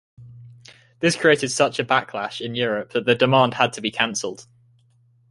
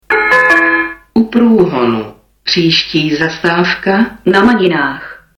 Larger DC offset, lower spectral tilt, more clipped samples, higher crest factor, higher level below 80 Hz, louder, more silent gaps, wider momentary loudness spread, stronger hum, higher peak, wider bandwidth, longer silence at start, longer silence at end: neither; second, -4 dB/octave vs -5.5 dB/octave; neither; first, 20 dB vs 10 dB; second, -62 dBFS vs -44 dBFS; second, -20 LUFS vs -11 LUFS; neither; first, 11 LU vs 8 LU; neither; about the same, -2 dBFS vs -2 dBFS; about the same, 11.5 kHz vs 11 kHz; about the same, 0.2 s vs 0.1 s; first, 0.9 s vs 0.25 s